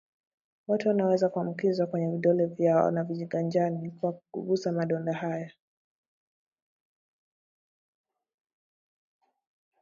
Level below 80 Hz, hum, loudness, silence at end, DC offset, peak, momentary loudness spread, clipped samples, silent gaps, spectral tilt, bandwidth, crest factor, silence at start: -78 dBFS; none; -28 LUFS; 4.3 s; under 0.1%; -10 dBFS; 9 LU; under 0.1%; none; -8 dB/octave; 7.4 kHz; 20 dB; 0.7 s